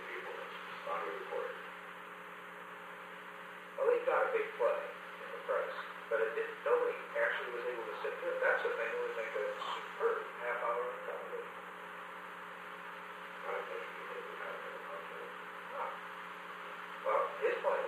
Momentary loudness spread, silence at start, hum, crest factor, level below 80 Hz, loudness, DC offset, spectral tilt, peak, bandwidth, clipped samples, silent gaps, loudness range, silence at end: 14 LU; 0 s; none; 20 dB; -86 dBFS; -39 LUFS; under 0.1%; -3.5 dB/octave; -18 dBFS; 15.5 kHz; under 0.1%; none; 8 LU; 0 s